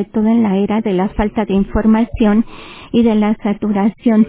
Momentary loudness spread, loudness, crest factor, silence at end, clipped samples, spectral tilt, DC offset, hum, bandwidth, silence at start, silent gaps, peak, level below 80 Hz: 5 LU; -15 LUFS; 12 dB; 0 s; under 0.1%; -12 dB/octave; under 0.1%; none; 4 kHz; 0 s; none; -2 dBFS; -32 dBFS